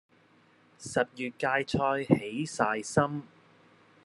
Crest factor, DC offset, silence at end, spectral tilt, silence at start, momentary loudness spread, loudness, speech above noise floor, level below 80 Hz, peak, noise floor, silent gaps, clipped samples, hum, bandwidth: 24 dB; under 0.1%; 0.8 s; -5.5 dB/octave; 0.8 s; 7 LU; -30 LUFS; 33 dB; -64 dBFS; -6 dBFS; -63 dBFS; none; under 0.1%; none; 12 kHz